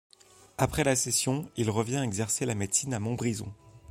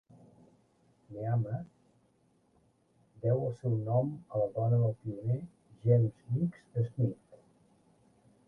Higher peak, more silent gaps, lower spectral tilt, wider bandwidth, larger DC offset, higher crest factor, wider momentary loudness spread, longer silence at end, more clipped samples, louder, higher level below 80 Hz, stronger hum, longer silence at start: first, -8 dBFS vs -14 dBFS; neither; second, -4 dB/octave vs -11.5 dB/octave; first, 16.5 kHz vs 2.2 kHz; neither; about the same, 22 dB vs 18 dB; second, 7 LU vs 12 LU; second, 0 s vs 1.15 s; neither; first, -29 LUFS vs -33 LUFS; first, -54 dBFS vs -66 dBFS; neither; second, 0.6 s vs 1.1 s